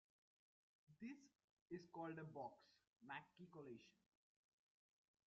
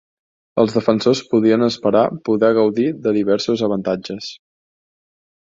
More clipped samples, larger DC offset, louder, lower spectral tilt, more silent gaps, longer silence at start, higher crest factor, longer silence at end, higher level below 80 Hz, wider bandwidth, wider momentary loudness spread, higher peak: neither; neither; second, -58 LUFS vs -17 LUFS; about the same, -5 dB/octave vs -6 dB/octave; first, 1.44-1.66 s, 2.87-2.93 s vs none; first, 0.9 s vs 0.55 s; about the same, 20 dB vs 18 dB; first, 1.35 s vs 1.1 s; second, under -90 dBFS vs -58 dBFS; about the same, 7.2 kHz vs 7.8 kHz; about the same, 9 LU vs 9 LU; second, -42 dBFS vs -2 dBFS